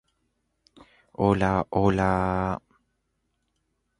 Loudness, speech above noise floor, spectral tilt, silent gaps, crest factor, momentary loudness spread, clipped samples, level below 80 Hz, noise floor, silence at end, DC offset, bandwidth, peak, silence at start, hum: -25 LUFS; 52 dB; -8 dB/octave; none; 22 dB; 10 LU; under 0.1%; -46 dBFS; -75 dBFS; 1.45 s; under 0.1%; 10.5 kHz; -6 dBFS; 1.2 s; none